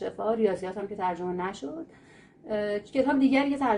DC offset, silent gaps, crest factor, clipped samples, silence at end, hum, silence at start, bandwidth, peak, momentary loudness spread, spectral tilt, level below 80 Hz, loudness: under 0.1%; none; 16 dB; under 0.1%; 0 s; none; 0 s; 10.5 kHz; -10 dBFS; 15 LU; -6.5 dB/octave; -62 dBFS; -28 LUFS